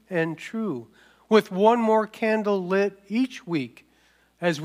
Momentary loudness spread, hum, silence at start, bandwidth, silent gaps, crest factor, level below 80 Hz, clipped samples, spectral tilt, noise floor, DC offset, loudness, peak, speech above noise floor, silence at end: 11 LU; none; 0.1 s; 15.5 kHz; none; 20 dB; -72 dBFS; under 0.1%; -6.5 dB/octave; -62 dBFS; under 0.1%; -24 LUFS; -4 dBFS; 38 dB; 0 s